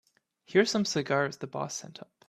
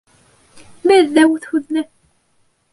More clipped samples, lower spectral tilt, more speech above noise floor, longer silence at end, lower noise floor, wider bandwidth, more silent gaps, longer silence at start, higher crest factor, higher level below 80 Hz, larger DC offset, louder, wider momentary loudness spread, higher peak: neither; about the same, -4 dB/octave vs -3.5 dB/octave; second, 30 dB vs 47 dB; second, 0.25 s vs 0.9 s; about the same, -59 dBFS vs -61 dBFS; first, 13.5 kHz vs 11.5 kHz; neither; second, 0.5 s vs 0.85 s; first, 22 dB vs 16 dB; second, -72 dBFS vs -62 dBFS; neither; second, -29 LUFS vs -15 LUFS; about the same, 12 LU vs 12 LU; second, -10 dBFS vs -2 dBFS